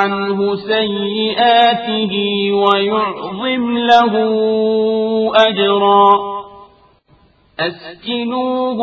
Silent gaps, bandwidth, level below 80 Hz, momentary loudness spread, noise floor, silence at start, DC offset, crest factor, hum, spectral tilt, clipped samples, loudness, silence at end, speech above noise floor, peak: none; 6.8 kHz; -56 dBFS; 11 LU; -52 dBFS; 0 s; under 0.1%; 14 dB; none; -6 dB/octave; under 0.1%; -14 LUFS; 0 s; 37 dB; 0 dBFS